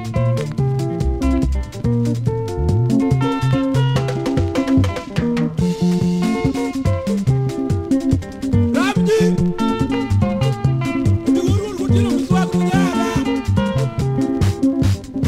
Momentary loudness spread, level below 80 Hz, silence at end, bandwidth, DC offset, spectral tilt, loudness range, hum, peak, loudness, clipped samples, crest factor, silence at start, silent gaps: 4 LU; -30 dBFS; 0 s; 14.5 kHz; under 0.1%; -7.5 dB/octave; 1 LU; none; -2 dBFS; -18 LUFS; under 0.1%; 14 dB; 0 s; none